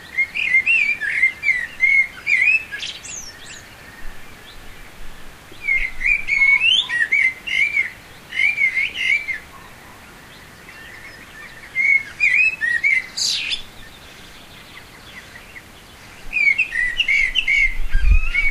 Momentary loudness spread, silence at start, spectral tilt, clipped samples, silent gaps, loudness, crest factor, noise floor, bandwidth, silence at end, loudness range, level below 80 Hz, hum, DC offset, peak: 23 LU; 0 s; -1 dB/octave; under 0.1%; none; -16 LUFS; 18 dB; -42 dBFS; 15.5 kHz; 0 s; 8 LU; -30 dBFS; none; under 0.1%; -2 dBFS